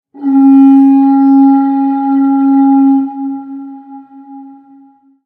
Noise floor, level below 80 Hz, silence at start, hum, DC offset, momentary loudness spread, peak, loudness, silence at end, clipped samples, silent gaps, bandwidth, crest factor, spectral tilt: -43 dBFS; -72 dBFS; 0.15 s; none; under 0.1%; 17 LU; 0 dBFS; -8 LUFS; 0.8 s; under 0.1%; none; 2.6 kHz; 10 dB; -9 dB/octave